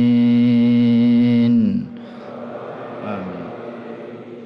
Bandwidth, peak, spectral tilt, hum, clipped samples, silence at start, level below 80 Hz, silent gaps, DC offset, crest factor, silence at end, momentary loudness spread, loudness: 5.4 kHz; -8 dBFS; -9.5 dB/octave; none; under 0.1%; 0 s; -62 dBFS; none; under 0.1%; 8 dB; 0 s; 19 LU; -16 LUFS